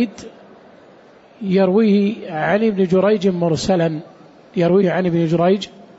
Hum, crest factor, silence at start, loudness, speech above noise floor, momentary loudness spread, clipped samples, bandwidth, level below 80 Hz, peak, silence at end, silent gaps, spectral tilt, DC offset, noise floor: none; 12 dB; 0 s; -17 LUFS; 30 dB; 9 LU; under 0.1%; 8 kHz; -52 dBFS; -6 dBFS; 0.3 s; none; -7 dB/octave; under 0.1%; -46 dBFS